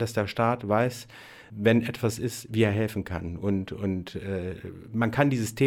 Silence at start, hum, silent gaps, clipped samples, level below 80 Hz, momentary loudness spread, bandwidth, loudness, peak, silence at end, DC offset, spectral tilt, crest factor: 0 s; none; none; under 0.1%; -54 dBFS; 12 LU; 17 kHz; -27 LUFS; -8 dBFS; 0 s; under 0.1%; -6.5 dB/octave; 20 dB